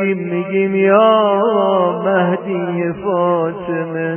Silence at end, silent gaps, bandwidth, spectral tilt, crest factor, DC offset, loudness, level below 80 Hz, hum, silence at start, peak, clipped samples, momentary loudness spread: 0 s; none; 3.3 kHz; -10.5 dB/octave; 14 dB; under 0.1%; -15 LUFS; -58 dBFS; none; 0 s; 0 dBFS; under 0.1%; 9 LU